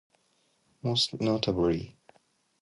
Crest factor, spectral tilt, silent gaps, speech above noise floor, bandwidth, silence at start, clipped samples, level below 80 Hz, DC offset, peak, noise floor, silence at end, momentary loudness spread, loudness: 20 dB; -5.5 dB/octave; none; 43 dB; 11.5 kHz; 0.85 s; under 0.1%; -54 dBFS; under 0.1%; -12 dBFS; -71 dBFS; 0.7 s; 9 LU; -28 LUFS